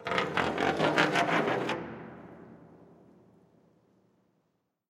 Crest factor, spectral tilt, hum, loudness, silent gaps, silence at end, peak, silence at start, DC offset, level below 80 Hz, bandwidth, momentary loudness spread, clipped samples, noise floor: 26 dB; -4.5 dB/octave; none; -28 LUFS; none; 2.05 s; -6 dBFS; 0 s; under 0.1%; -66 dBFS; 15.5 kHz; 23 LU; under 0.1%; -77 dBFS